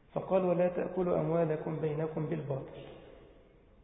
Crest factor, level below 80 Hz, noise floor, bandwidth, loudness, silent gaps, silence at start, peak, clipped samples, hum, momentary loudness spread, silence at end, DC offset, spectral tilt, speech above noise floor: 18 dB; -62 dBFS; -60 dBFS; 3.8 kHz; -33 LUFS; none; 0.15 s; -16 dBFS; under 0.1%; none; 18 LU; 0.5 s; under 0.1%; -6.5 dB/octave; 28 dB